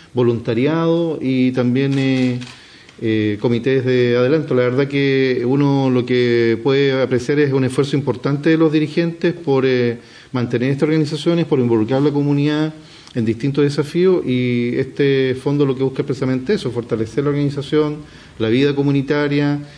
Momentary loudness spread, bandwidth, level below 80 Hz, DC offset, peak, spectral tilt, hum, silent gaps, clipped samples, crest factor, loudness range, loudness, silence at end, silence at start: 6 LU; 10.5 kHz; -54 dBFS; under 0.1%; -6 dBFS; -7.5 dB/octave; none; none; under 0.1%; 12 dB; 3 LU; -17 LUFS; 0 s; 0.15 s